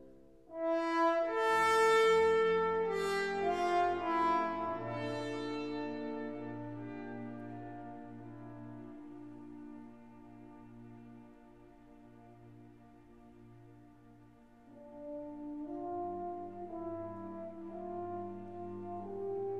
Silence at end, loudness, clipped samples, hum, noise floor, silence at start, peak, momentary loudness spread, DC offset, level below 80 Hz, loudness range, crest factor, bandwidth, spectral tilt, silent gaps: 0 s; -35 LUFS; under 0.1%; none; -60 dBFS; 0 s; -18 dBFS; 25 LU; under 0.1%; -68 dBFS; 24 LU; 20 dB; 13.5 kHz; -5 dB/octave; none